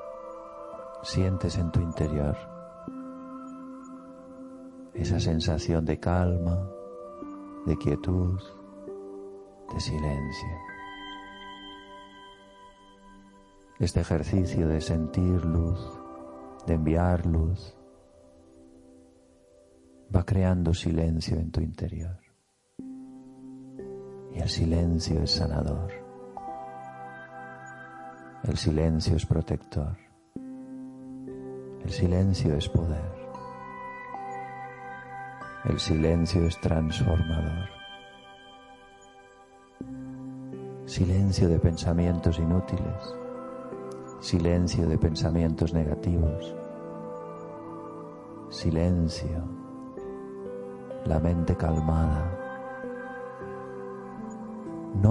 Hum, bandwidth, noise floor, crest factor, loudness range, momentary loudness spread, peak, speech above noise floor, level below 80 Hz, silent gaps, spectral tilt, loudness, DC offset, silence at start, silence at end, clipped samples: none; 11 kHz; -68 dBFS; 22 dB; 8 LU; 18 LU; -6 dBFS; 42 dB; -42 dBFS; none; -7 dB/octave; -29 LUFS; under 0.1%; 0 s; 0 s; under 0.1%